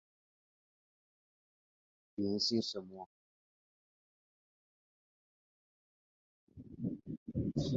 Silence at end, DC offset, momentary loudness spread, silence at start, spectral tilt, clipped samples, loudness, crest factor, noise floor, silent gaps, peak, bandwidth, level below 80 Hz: 0 s; under 0.1%; 21 LU; 2.2 s; -7 dB/octave; under 0.1%; -38 LUFS; 22 dB; under -90 dBFS; 3.06-6.47 s, 7.17-7.26 s; -22 dBFS; 7.4 kHz; -64 dBFS